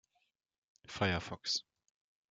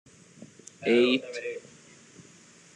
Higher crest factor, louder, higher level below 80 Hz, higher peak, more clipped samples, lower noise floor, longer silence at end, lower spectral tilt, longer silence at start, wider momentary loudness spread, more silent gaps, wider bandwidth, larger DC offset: about the same, 24 dB vs 20 dB; second, -36 LUFS vs -26 LUFS; first, -68 dBFS vs -80 dBFS; second, -18 dBFS vs -10 dBFS; neither; first, -81 dBFS vs -54 dBFS; second, 0.7 s vs 1.15 s; about the same, -3.5 dB/octave vs -4 dB/octave; first, 0.9 s vs 0.4 s; second, 5 LU vs 25 LU; neither; about the same, 9.4 kHz vs 10 kHz; neither